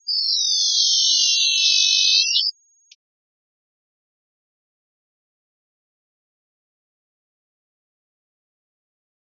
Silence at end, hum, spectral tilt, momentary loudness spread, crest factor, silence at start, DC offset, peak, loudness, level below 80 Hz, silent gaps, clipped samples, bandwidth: 6.7 s; none; 16.5 dB/octave; 5 LU; 20 dB; 0.05 s; under 0.1%; -4 dBFS; -15 LUFS; under -90 dBFS; none; under 0.1%; 7 kHz